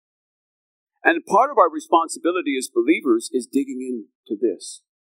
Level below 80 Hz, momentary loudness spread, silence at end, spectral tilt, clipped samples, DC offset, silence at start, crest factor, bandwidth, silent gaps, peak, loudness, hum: under -90 dBFS; 14 LU; 0.35 s; -3.5 dB/octave; under 0.1%; under 0.1%; 1.05 s; 20 dB; 16 kHz; 4.15-4.23 s; 0 dBFS; -21 LUFS; none